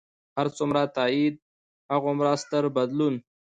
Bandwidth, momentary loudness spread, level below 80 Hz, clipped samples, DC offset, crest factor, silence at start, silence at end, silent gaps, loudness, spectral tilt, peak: 9.2 kHz; 6 LU; -68 dBFS; under 0.1%; under 0.1%; 16 dB; 0.35 s; 0.25 s; 1.42-1.89 s; -26 LUFS; -6 dB/octave; -10 dBFS